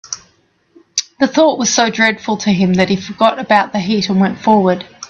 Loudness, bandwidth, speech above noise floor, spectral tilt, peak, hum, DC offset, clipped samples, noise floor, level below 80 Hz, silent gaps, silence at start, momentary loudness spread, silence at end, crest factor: -14 LUFS; 7.6 kHz; 43 dB; -4 dB/octave; 0 dBFS; none; under 0.1%; under 0.1%; -56 dBFS; -52 dBFS; none; 0.1 s; 8 LU; 0.05 s; 14 dB